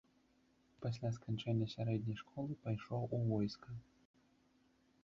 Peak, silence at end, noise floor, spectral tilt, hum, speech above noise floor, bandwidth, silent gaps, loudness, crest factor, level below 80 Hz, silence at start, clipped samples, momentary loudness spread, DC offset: -26 dBFS; 1.2 s; -74 dBFS; -7.5 dB/octave; none; 34 dB; 7.4 kHz; none; -42 LUFS; 16 dB; -70 dBFS; 0.8 s; under 0.1%; 8 LU; under 0.1%